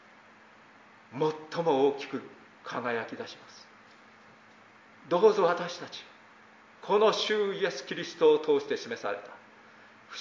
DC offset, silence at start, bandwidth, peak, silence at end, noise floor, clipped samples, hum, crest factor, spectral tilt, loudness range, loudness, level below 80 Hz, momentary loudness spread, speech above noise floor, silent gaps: under 0.1%; 1.1 s; 7.6 kHz; -10 dBFS; 0 s; -56 dBFS; under 0.1%; none; 20 dB; -4.5 dB/octave; 5 LU; -29 LUFS; -84 dBFS; 21 LU; 28 dB; none